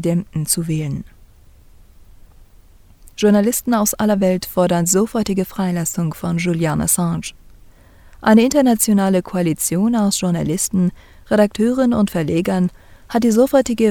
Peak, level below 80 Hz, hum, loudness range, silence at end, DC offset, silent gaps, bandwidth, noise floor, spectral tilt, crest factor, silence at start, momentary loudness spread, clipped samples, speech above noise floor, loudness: 0 dBFS; -44 dBFS; none; 4 LU; 0 s; under 0.1%; none; 19 kHz; -46 dBFS; -5 dB/octave; 18 dB; 0 s; 8 LU; under 0.1%; 29 dB; -17 LUFS